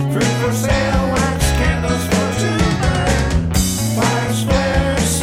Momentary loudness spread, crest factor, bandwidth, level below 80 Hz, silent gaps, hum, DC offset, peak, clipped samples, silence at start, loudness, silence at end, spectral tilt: 1 LU; 14 dB; 16.5 kHz; -24 dBFS; none; none; under 0.1%; -2 dBFS; under 0.1%; 0 s; -17 LUFS; 0 s; -5 dB/octave